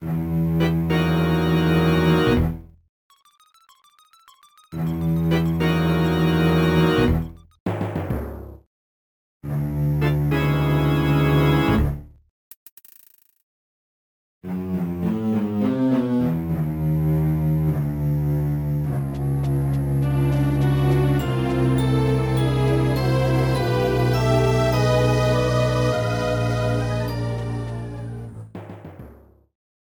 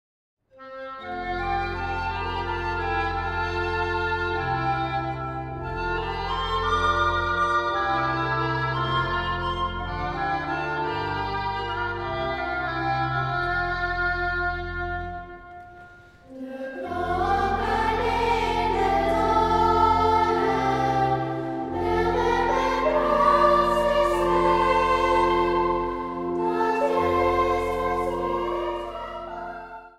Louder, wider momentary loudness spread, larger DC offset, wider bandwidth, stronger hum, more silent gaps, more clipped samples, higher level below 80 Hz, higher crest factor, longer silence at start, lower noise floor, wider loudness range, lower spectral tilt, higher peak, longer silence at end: first, -21 LUFS vs -24 LUFS; about the same, 11 LU vs 11 LU; neither; first, 19 kHz vs 14.5 kHz; neither; first, 2.89-3.10 s, 7.60-7.66 s, 8.67-9.40 s, 12.30-12.66 s, 12.72-12.77 s, 13.43-14.41 s vs none; neither; first, -34 dBFS vs -40 dBFS; about the same, 16 dB vs 16 dB; second, 0 s vs 0.55 s; first, -57 dBFS vs -48 dBFS; about the same, 7 LU vs 7 LU; first, -7.5 dB/octave vs -6 dB/octave; first, -4 dBFS vs -8 dBFS; first, 0.85 s vs 0.1 s